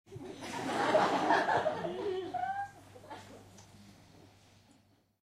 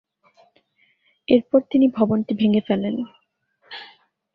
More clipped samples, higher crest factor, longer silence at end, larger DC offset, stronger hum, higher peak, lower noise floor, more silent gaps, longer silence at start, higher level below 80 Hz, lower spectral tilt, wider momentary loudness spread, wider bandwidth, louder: neither; about the same, 20 dB vs 18 dB; first, 1.3 s vs 0.5 s; neither; neither; second, -14 dBFS vs -4 dBFS; about the same, -67 dBFS vs -65 dBFS; neither; second, 0.1 s vs 1.3 s; second, -72 dBFS vs -62 dBFS; second, -4.5 dB/octave vs -10 dB/octave; about the same, 21 LU vs 20 LU; first, 15 kHz vs 5.2 kHz; second, -33 LUFS vs -20 LUFS